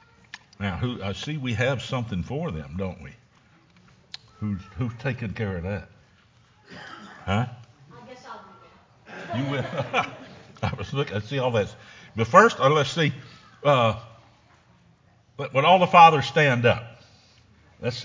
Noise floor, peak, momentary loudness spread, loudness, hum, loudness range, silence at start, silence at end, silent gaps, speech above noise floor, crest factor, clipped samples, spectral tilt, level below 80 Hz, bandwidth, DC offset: -58 dBFS; -2 dBFS; 26 LU; -23 LUFS; none; 13 LU; 0.35 s; 0 s; none; 36 dB; 24 dB; under 0.1%; -5.5 dB/octave; -50 dBFS; 7.6 kHz; under 0.1%